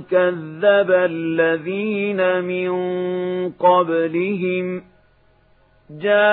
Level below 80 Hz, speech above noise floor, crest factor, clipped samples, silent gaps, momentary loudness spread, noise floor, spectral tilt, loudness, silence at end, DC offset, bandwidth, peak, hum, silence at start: -64 dBFS; 37 dB; 16 dB; under 0.1%; none; 7 LU; -56 dBFS; -11 dB/octave; -19 LUFS; 0 s; under 0.1%; 4.1 kHz; -2 dBFS; none; 0 s